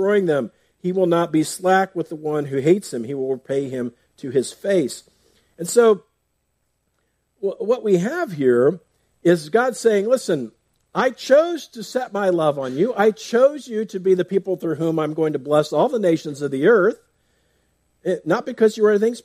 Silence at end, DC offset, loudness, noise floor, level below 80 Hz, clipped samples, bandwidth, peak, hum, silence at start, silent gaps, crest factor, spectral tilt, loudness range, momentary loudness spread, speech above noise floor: 0.05 s; under 0.1%; -20 LUFS; -71 dBFS; -68 dBFS; under 0.1%; 15.5 kHz; -4 dBFS; none; 0 s; none; 16 dB; -5.5 dB/octave; 3 LU; 11 LU; 52 dB